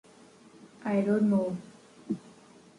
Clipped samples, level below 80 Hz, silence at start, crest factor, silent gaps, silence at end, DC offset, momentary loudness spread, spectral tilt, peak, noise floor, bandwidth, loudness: under 0.1%; -74 dBFS; 0.65 s; 16 dB; none; 0.5 s; under 0.1%; 13 LU; -8.5 dB/octave; -16 dBFS; -56 dBFS; 10.5 kHz; -30 LUFS